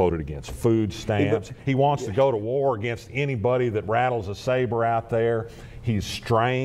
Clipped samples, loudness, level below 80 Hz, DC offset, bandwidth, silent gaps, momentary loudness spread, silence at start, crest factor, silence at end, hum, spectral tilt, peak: under 0.1%; -24 LUFS; -46 dBFS; under 0.1%; 14.5 kHz; none; 6 LU; 0 s; 16 dB; 0 s; none; -6.5 dB/octave; -8 dBFS